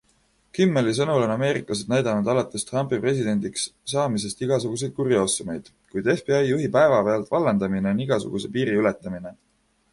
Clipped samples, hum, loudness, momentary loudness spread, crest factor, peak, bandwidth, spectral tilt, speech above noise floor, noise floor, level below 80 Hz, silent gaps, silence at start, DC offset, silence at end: under 0.1%; none; -23 LUFS; 8 LU; 16 dB; -6 dBFS; 11.5 kHz; -5.5 dB/octave; 41 dB; -64 dBFS; -58 dBFS; none; 0.55 s; under 0.1%; 0.6 s